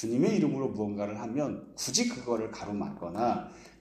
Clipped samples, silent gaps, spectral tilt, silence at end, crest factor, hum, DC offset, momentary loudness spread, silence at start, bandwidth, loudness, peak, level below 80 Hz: under 0.1%; none; -4.5 dB/octave; 0.1 s; 20 dB; none; under 0.1%; 9 LU; 0 s; 15 kHz; -31 LUFS; -12 dBFS; -64 dBFS